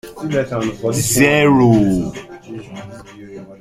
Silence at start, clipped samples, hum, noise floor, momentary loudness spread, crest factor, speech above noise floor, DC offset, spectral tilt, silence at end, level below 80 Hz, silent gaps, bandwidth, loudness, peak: 0.05 s; under 0.1%; none; -35 dBFS; 24 LU; 16 dB; 20 dB; under 0.1%; -5 dB/octave; 0.05 s; -42 dBFS; none; 16 kHz; -15 LUFS; 0 dBFS